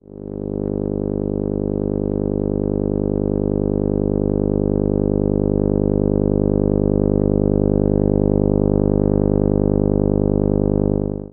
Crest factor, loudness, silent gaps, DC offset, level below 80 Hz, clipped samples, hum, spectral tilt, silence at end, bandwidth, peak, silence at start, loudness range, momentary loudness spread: 16 dB; -19 LUFS; none; under 0.1%; -28 dBFS; under 0.1%; 50 Hz at -20 dBFS; -15.5 dB/octave; 0.05 s; 2.1 kHz; -2 dBFS; 0.15 s; 4 LU; 5 LU